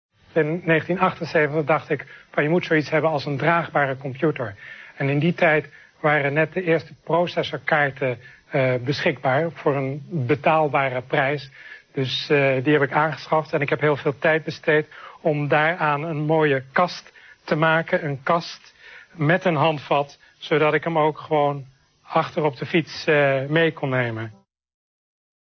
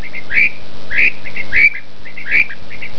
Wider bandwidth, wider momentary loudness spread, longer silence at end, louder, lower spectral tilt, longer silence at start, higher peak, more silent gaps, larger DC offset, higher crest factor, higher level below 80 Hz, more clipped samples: first, 6.6 kHz vs 5.4 kHz; second, 9 LU vs 19 LU; first, 1.1 s vs 0 s; second, -22 LUFS vs -13 LUFS; first, -7 dB/octave vs -4 dB/octave; first, 0.35 s vs 0 s; second, -4 dBFS vs 0 dBFS; neither; second, under 0.1% vs 20%; about the same, 18 dB vs 16 dB; second, -64 dBFS vs -42 dBFS; neither